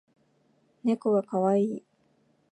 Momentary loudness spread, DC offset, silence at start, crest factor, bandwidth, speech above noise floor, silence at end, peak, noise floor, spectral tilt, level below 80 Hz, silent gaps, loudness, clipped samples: 7 LU; under 0.1%; 0.85 s; 18 dB; 9.2 kHz; 42 dB; 0.75 s; -12 dBFS; -68 dBFS; -8.5 dB/octave; -82 dBFS; none; -27 LUFS; under 0.1%